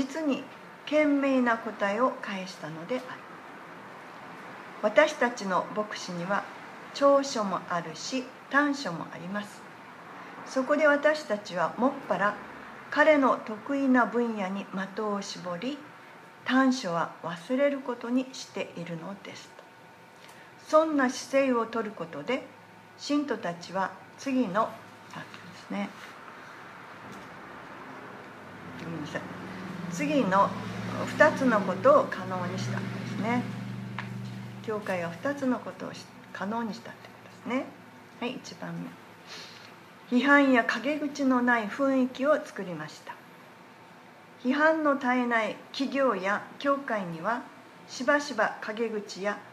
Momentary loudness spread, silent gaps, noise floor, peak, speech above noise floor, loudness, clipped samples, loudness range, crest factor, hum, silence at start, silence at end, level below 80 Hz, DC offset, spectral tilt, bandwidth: 21 LU; none; -52 dBFS; -6 dBFS; 24 dB; -28 LUFS; under 0.1%; 10 LU; 24 dB; none; 0 s; 0 s; -74 dBFS; under 0.1%; -5 dB/octave; 13.5 kHz